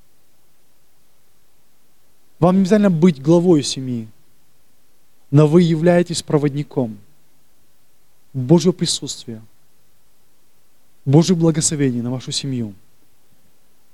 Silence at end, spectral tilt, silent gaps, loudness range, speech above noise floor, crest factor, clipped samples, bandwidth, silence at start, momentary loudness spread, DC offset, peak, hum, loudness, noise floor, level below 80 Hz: 1.2 s; -6 dB/octave; none; 5 LU; 45 dB; 18 dB; under 0.1%; 12.5 kHz; 2.4 s; 15 LU; 0.7%; 0 dBFS; none; -17 LUFS; -61 dBFS; -54 dBFS